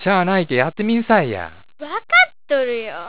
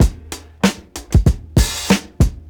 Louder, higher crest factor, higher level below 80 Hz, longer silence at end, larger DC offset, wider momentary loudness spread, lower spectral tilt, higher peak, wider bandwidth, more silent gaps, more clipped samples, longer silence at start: about the same, -17 LUFS vs -18 LUFS; about the same, 16 dB vs 16 dB; second, -54 dBFS vs -20 dBFS; about the same, 0 s vs 0.1 s; first, 1% vs under 0.1%; about the same, 15 LU vs 16 LU; first, -9 dB/octave vs -5 dB/octave; about the same, -2 dBFS vs 0 dBFS; second, 4 kHz vs over 20 kHz; neither; neither; about the same, 0 s vs 0 s